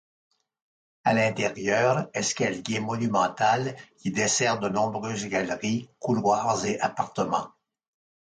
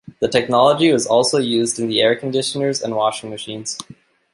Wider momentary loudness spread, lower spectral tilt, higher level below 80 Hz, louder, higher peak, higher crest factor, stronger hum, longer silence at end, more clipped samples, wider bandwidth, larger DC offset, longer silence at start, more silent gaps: second, 7 LU vs 13 LU; about the same, -4 dB/octave vs -3.5 dB/octave; about the same, -64 dBFS vs -60 dBFS; second, -26 LUFS vs -17 LUFS; second, -10 dBFS vs -2 dBFS; about the same, 18 dB vs 16 dB; neither; first, 0.85 s vs 0.5 s; neither; second, 9.6 kHz vs 11.5 kHz; neither; first, 1.05 s vs 0.2 s; neither